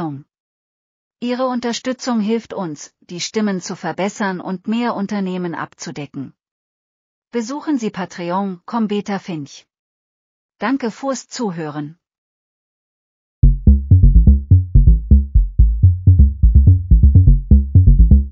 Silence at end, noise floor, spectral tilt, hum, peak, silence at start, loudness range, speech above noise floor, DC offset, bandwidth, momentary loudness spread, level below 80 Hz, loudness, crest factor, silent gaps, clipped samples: 0 s; under -90 dBFS; -7 dB/octave; none; 0 dBFS; 0 s; 12 LU; over 68 dB; under 0.1%; 7.6 kHz; 16 LU; -18 dBFS; -16 LUFS; 14 dB; 0.40-1.11 s, 6.51-7.22 s, 9.79-10.49 s, 12.18-13.42 s; under 0.1%